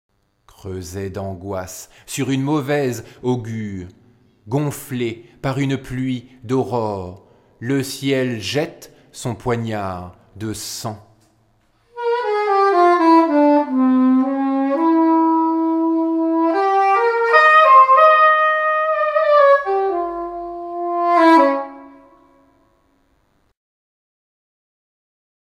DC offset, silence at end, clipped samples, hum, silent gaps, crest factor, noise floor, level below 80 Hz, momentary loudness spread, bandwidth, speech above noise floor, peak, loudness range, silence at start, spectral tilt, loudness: under 0.1%; 3.6 s; under 0.1%; none; none; 18 dB; -62 dBFS; -54 dBFS; 17 LU; 16 kHz; 39 dB; 0 dBFS; 12 LU; 0.65 s; -6 dB/octave; -16 LUFS